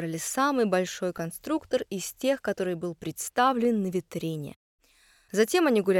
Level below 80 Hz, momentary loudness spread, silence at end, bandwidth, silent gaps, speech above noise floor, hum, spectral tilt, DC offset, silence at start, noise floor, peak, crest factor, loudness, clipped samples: -66 dBFS; 11 LU; 0 s; 17.5 kHz; 4.56-4.78 s; 35 dB; none; -4.5 dB/octave; under 0.1%; 0 s; -62 dBFS; -10 dBFS; 18 dB; -28 LUFS; under 0.1%